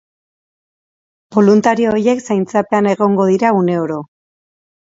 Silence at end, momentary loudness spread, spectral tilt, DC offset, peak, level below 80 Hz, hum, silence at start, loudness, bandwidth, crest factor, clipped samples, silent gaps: 0.85 s; 8 LU; -7 dB/octave; under 0.1%; 0 dBFS; -58 dBFS; none; 1.3 s; -14 LUFS; 7.8 kHz; 16 dB; under 0.1%; none